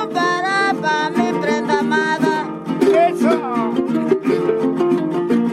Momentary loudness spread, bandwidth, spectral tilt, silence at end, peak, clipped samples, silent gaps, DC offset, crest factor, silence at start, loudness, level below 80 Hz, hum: 4 LU; 13 kHz; -5.5 dB/octave; 0 s; -4 dBFS; under 0.1%; none; under 0.1%; 14 dB; 0 s; -17 LUFS; -60 dBFS; none